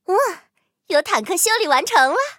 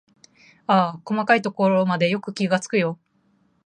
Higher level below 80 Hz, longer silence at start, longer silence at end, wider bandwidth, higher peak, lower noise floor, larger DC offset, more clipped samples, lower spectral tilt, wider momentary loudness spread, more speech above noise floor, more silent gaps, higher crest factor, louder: about the same, -74 dBFS vs -70 dBFS; second, 0.1 s vs 0.7 s; second, 0.05 s vs 0.7 s; first, 17 kHz vs 10 kHz; about the same, -2 dBFS vs -2 dBFS; second, -60 dBFS vs -64 dBFS; neither; neither; second, 0 dB/octave vs -6 dB/octave; about the same, 7 LU vs 7 LU; about the same, 42 dB vs 43 dB; neither; about the same, 18 dB vs 20 dB; first, -17 LUFS vs -21 LUFS